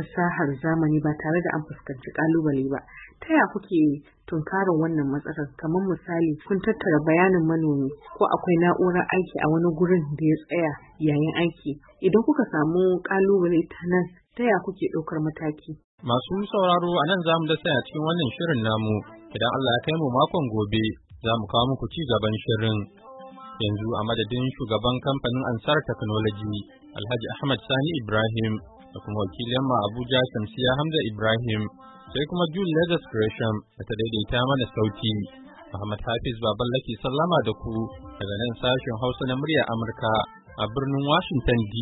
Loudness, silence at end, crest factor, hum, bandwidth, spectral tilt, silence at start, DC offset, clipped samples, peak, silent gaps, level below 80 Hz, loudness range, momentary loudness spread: -25 LUFS; 0 s; 18 dB; none; 4.1 kHz; -11 dB/octave; 0 s; under 0.1%; under 0.1%; -6 dBFS; 15.84-15.98 s; -48 dBFS; 4 LU; 10 LU